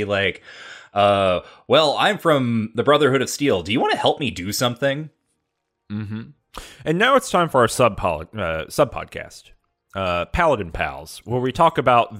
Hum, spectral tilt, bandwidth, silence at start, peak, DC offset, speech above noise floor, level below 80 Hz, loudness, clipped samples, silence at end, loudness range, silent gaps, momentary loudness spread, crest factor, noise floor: none; -4.5 dB/octave; 16 kHz; 0 s; -4 dBFS; under 0.1%; 56 dB; -44 dBFS; -20 LUFS; under 0.1%; 0 s; 5 LU; none; 18 LU; 18 dB; -76 dBFS